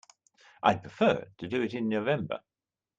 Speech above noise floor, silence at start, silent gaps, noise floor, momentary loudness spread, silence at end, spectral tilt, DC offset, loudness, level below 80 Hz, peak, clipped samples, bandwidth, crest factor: 32 dB; 0.65 s; none; -61 dBFS; 8 LU; 0.6 s; -6.5 dB/octave; under 0.1%; -30 LUFS; -68 dBFS; -8 dBFS; under 0.1%; 7.8 kHz; 24 dB